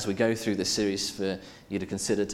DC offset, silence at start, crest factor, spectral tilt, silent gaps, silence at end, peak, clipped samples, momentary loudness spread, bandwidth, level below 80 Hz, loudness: under 0.1%; 0 s; 18 dB; -4 dB/octave; none; 0 s; -12 dBFS; under 0.1%; 9 LU; 16.5 kHz; -58 dBFS; -29 LUFS